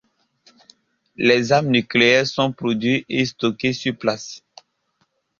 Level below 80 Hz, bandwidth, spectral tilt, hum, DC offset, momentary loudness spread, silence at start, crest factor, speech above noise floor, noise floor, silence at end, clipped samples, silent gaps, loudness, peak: -60 dBFS; 7.4 kHz; -5 dB/octave; none; under 0.1%; 9 LU; 1.2 s; 20 dB; 49 dB; -68 dBFS; 1 s; under 0.1%; none; -19 LUFS; -2 dBFS